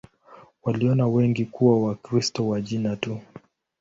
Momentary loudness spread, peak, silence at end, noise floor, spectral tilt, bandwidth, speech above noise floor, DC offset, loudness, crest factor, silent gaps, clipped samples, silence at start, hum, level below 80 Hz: 10 LU; -6 dBFS; 0.4 s; -51 dBFS; -7 dB/octave; 8 kHz; 28 dB; under 0.1%; -24 LUFS; 18 dB; none; under 0.1%; 0.3 s; none; -58 dBFS